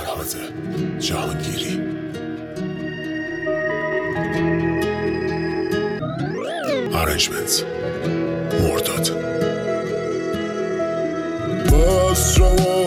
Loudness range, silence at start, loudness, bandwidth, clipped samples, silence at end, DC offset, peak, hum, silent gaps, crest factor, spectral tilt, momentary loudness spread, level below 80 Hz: 5 LU; 0 s; -21 LUFS; 18 kHz; under 0.1%; 0 s; under 0.1%; -2 dBFS; none; none; 18 dB; -4.5 dB/octave; 11 LU; -28 dBFS